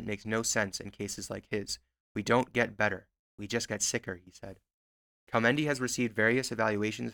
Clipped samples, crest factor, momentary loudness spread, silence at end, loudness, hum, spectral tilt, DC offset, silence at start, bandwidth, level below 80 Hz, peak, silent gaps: under 0.1%; 22 dB; 15 LU; 0 s; -31 LUFS; none; -3.5 dB/octave; under 0.1%; 0 s; 19 kHz; -62 dBFS; -10 dBFS; 2.00-2.15 s, 3.19-3.38 s, 4.74-5.27 s